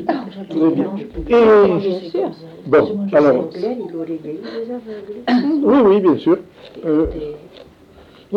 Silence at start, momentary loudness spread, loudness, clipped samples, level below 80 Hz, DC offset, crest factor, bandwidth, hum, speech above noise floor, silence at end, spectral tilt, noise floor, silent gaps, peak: 0 s; 16 LU; -16 LUFS; under 0.1%; -42 dBFS; under 0.1%; 14 dB; 6.6 kHz; none; 29 dB; 0 s; -8.5 dB/octave; -45 dBFS; none; -2 dBFS